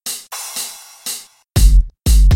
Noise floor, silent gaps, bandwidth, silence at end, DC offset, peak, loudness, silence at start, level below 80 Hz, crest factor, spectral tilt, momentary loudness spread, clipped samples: -30 dBFS; none; 16.5 kHz; 0 s; under 0.1%; 0 dBFS; -19 LUFS; 0.05 s; -14 dBFS; 14 dB; -4 dB/octave; 14 LU; under 0.1%